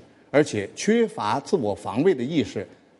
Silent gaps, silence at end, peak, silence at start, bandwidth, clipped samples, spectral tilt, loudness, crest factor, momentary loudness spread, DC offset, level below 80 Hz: none; 0.35 s; -4 dBFS; 0.35 s; 11.5 kHz; under 0.1%; -5.5 dB/octave; -24 LUFS; 20 dB; 5 LU; under 0.1%; -64 dBFS